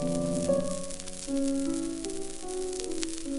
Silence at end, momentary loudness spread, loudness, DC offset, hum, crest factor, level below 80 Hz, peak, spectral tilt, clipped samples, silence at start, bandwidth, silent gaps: 0 s; 8 LU; -32 LUFS; under 0.1%; none; 24 dB; -46 dBFS; -8 dBFS; -5 dB/octave; under 0.1%; 0 s; 12 kHz; none